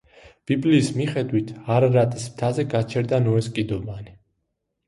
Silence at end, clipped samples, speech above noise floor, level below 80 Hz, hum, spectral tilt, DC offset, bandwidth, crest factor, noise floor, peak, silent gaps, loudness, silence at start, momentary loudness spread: 0.75 s; under 0.1%; 55 dB; -52 dBFS; none; -7 dB/octave; under 0.1%; 11.5 kHz; 16 dB; -76 dBFS; -6 dBFS; none; -22 LUFS; 0.25 s; 10 LU